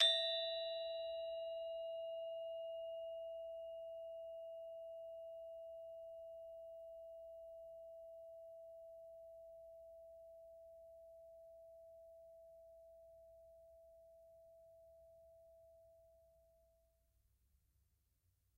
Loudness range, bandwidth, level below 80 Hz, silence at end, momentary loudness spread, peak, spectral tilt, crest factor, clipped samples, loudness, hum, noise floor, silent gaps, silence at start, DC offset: 19 LU; 15.5 kHz; -82 dBFS; 2.05 s; 20 LU; -18 dBFS; 1 dB/octave; 30 dB; under 0.1%; -47 LUFS; none; -81 dBFS; none; 0 s; under 0.1%